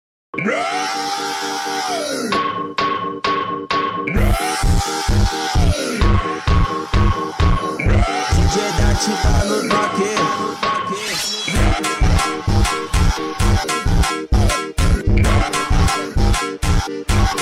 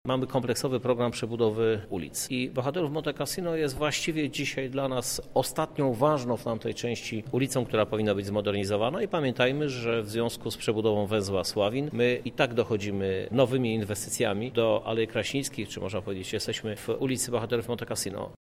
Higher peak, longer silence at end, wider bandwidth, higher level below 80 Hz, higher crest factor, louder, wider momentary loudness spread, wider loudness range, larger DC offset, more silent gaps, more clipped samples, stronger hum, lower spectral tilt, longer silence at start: about the same, -6 dBFS vs -8 dBFS; about the same, 0 s vs 0.05 s; about the same, 16 kHz vs 16 kHz; first, -20 dBFS vs -56 dBFS; second, 12 dB vs 20 dB; first, -18 LUFS vs -29 LUFS; about the same, 4 LU vs 6 LU; about the same, 2 LU vs 2 LU; neither; neither; neither; neither; about the same, -4.5 dB/octave vs -5 dB/octave; first, 0.35 s vs 0.05 s